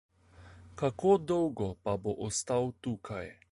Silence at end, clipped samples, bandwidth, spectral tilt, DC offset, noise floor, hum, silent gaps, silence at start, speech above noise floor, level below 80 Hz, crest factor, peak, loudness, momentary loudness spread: 0.2 s; under 0.1%; 11.5 kHz; -5.5 dB/octave; under 0.1%; -56 dBFS; none; none; 0.4 s; 24 dB; -58 dBFS; 20 dB; -14 dBFS; -32 LUFS; 13 LU